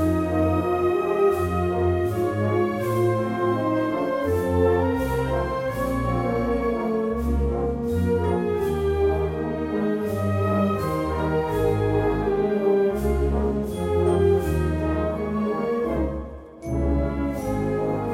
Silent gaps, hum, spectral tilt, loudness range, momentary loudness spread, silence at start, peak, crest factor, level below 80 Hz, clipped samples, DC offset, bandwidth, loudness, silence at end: none; none; -8 dB/octave; 2 LU; 5 LU; 0 s; -8 dBFS; 14 dB; -34 dBFS; under 0.1%; under 0.1%; 16 kHz; -23 LUFS; 0 s